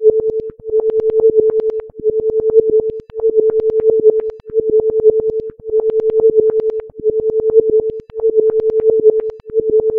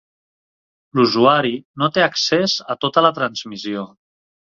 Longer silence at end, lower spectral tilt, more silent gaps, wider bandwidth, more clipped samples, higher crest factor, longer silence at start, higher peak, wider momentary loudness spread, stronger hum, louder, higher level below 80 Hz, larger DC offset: second, 0 s vs 0.55 s; first, -10.5 dB/octave vs -4.5 dB/octave; second, none vs 1.65-1.74 s; second, 2.1 kHz vs 7.6 kHz; neither; about the same, 14 dB vs 18 dB; second, 0 s vs 0.95 s; about the same, 0 dBFS vs -2 dBFS; second, 8 LU vs 13 LU; neither; first, -15 LUFS vs -18 LUFS; first, -46 dBFS vs -62 dBFS; first, 0.2% vs under 0.1%